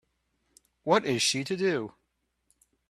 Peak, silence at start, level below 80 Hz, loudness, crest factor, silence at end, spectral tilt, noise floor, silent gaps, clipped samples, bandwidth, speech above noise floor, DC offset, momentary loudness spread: -8 dBFS; 0.85 s; -70 dBFS; -27 LUFS; 24 dB; 1 s; -3.5 dB/octave; -78 dBFS; none; under 0.1%; 13.5 kHz; 51 dB; under 0.1%; 13 LU